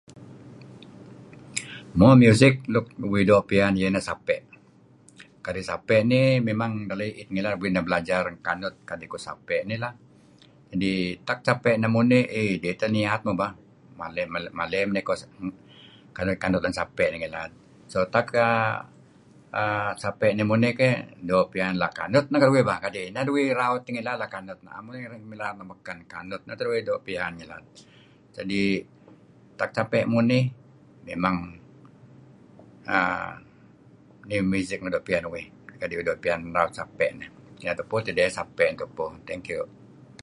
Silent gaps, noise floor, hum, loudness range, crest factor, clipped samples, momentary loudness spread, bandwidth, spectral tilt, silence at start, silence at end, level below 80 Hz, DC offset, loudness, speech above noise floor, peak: none; -55 dBFS; none; 9 LU; 26 dB; under 0.1%; 17 LU; 11.5 kHz; -6.5 dB/octave; 0.1 s; 0.55 s; -54 dBFS; under 0.1%; -25 LUFS; 31 dB; 0 dBFS